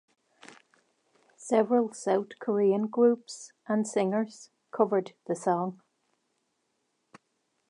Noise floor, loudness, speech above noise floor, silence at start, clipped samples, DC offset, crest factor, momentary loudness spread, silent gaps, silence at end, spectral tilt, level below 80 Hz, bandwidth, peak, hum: -77 dBFS; -28 LUFS; 50 dB; 1.4 s; under 0.1%; under 0.1%; 20 dB; 12 LU; none; 1.95 s; -6 dB/octave; -86 dBFS; 11 kHz; -10 dBFS; none